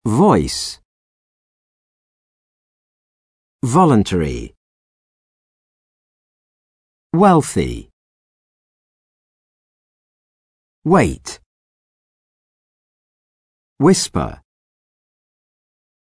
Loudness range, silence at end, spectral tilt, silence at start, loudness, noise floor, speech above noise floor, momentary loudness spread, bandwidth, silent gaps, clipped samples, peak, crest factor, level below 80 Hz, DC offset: 5 LU; 1.75 s; -6 dB/octave; 0.05 s; -16 LUFS; under -90 dBFS; over 75 dB; 18 LU; 11 kHz; 0.85-3.59 s, 4.57-7.10 s, 7.93-10.82 s, 11.46-13.76 s; under 0.1%; -2 dBFS; 20 dB; -42 dBFS; under 0.1%